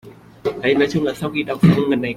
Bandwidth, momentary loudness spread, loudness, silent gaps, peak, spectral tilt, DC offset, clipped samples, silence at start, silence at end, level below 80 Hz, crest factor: 14 kHz; 10 LU; -18 LUFS; none; -2 dBFS; -7 dB/octave; under 0.1%; under 0.1%; 0.05 s; 0 s; -48 dBFS; 16 dB